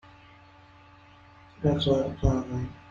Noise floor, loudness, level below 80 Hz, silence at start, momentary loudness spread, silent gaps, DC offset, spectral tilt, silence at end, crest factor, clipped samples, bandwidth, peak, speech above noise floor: -54 dBFS; -27 LUFS; -40 dBFS; 1.6 s; 9 LU; none; under 0.1%; -7.5 dB/octave; 0.1 s; 22 dB; under 0.1%; 7.4 kHz; -8 dBFS; 27 dB